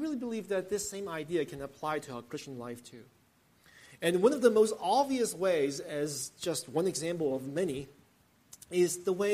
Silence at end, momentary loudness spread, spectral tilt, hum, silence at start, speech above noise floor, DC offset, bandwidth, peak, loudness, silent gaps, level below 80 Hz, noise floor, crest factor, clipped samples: 0 s; 15 LU; -4.5 dB/octave; none; 0 s; 35 dB; under 0.1%; 15 kHz; -10 dBFS; -32 LUFS; none; -70 dBFS; -66 dBFS; 22 dB; under 0.1%